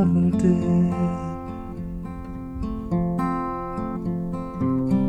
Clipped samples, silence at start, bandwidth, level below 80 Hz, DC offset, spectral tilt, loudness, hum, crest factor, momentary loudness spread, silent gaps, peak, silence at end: under 0.1%; 0 s; 8.6 kHz; -40 dBFS; under 0.1%; -9.5 dB/octave; -25 LUFS; none; 16 dB; 14 LU; none; -8 dBFS; 0 s